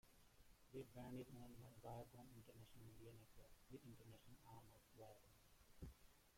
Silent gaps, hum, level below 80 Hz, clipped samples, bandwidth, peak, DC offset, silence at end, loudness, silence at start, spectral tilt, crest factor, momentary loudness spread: none; none; -72 dBFS; under 0.1%; 16.5 kHz; -44 dBFS; under 0.1%; 0 s; -62 LUFS; 0.05 s; -6 dB/octave; 18 dB; 9 LU